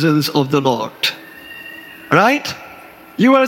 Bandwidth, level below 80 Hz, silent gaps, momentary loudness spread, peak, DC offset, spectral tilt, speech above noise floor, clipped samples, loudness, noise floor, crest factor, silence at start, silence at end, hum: 17.5 kHz; -60 dBFS; none; 20 LU; 0 dBFS; under 0.1%; -5.5 dB/octave; 25 dB; under 0.1%; -16 LUFS; -39 dBFS; 16 dB; 0 s; 0 s; none